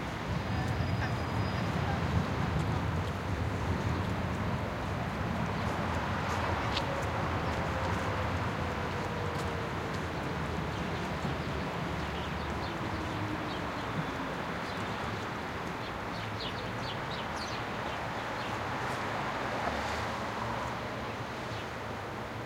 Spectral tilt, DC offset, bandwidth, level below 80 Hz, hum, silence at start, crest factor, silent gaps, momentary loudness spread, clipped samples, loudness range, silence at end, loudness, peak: -6 dB/octave; under 0.1%; 16.5 kHz; -48 dBFS; none; 0 s; 18 dB; none; 5 LU; under 0.1%; 3 LU; 0 s; -34 LUFS; -16 dBFS